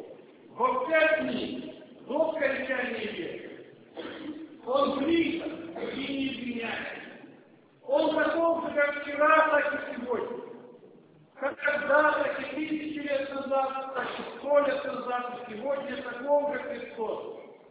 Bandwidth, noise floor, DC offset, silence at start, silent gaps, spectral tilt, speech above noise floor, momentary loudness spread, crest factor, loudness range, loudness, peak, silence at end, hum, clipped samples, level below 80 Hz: 4 kHz; -57 dBFS; under 0.1%; 0 s; none; -8 dB/octave; 29 dB; 18 LU; 20 dB; 5 LU; -29 LUFS; -10 dBFS; 0.15 s; none; under 0.1%; -68 dBFS